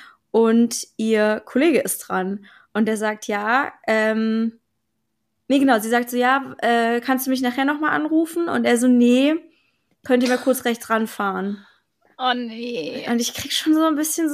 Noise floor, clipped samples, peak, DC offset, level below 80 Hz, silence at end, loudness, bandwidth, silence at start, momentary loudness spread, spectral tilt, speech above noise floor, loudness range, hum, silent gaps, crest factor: -75 dBFS; under 0.1%; -4 dBFS; under 0.1%; -68 dBFS; 0 s; -20 LUFS; 15.5 kHz; 0 s; 9 LU; -3.5 dB/octave; 56 dB; 4 LU; none; none; 16 dB